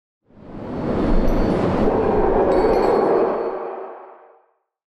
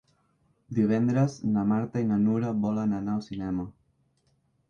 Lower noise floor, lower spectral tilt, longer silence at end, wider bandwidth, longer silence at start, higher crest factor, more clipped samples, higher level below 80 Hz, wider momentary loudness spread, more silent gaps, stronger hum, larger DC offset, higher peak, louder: second, -61 dBFS vs -70 dBFS; about the same, -8.5 dB/octave vs -8.5 dB/octave; second, 0.85 s vs 1 s; first, 8.2 kHz vs 7.2 kHz; second, 0.4 s vs 0.7 s; about the same, 14 dB vs 16 dB; neither; first, -28 dBFS vs -58 dBFS; first, 17 LU vs 8 LU; neither; neither; neither; first, -6 dBFS vs -12 dBFS; first, -19 LUFS vs -27 LUFS